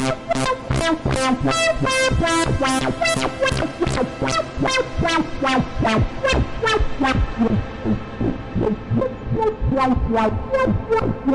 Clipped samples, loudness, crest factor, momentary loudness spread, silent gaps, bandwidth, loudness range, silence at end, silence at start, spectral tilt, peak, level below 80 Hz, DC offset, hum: under 0.1%; -20 LUFS; 12 dB; 5 LU; none; 11.5 kHz; 3 LU; 0 s; 0 s; -5 dB/octave; -8 dBFS; -30 dBFS; under 0.1%; none